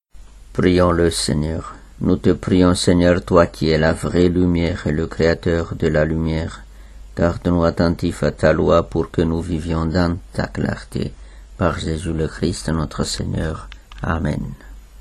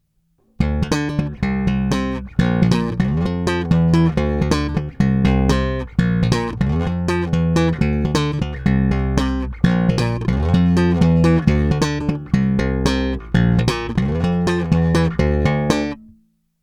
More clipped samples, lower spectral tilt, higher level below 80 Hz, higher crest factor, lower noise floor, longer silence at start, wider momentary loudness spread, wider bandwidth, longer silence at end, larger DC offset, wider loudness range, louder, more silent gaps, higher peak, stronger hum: neither; about the same, -6 dB/octave vs -7 dB/octave; about the same, -32 dBFS vs -28 dBFS; about the same, 18 dB vs 18 dB; second, -41 dBFS vs -62 dBFS; second, 0.15 s vs 0.6 s; first, 12 LU vs 5 LU; first, 13 kHz vs 11 kHz; second, 0.05 s vs 0.6 s; neither; first, 7 LU vs 2 LU; about the same, -19 LUFS vs -18 LUFS; neither; about the same, 0 dBFS vs 0 dBFS; neither